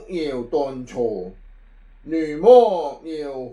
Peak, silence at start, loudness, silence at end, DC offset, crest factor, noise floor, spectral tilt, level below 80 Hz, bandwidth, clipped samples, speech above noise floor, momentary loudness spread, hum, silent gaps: -2 dBFS; 0 s; -19 LUFS; 0 s; under 0.1%; 18 dB; -47 dBFS; -6.5 dB/octave; -48 dBFS; 7.2 kHz; under 0.1%; 27 dB; 18 LU; none; none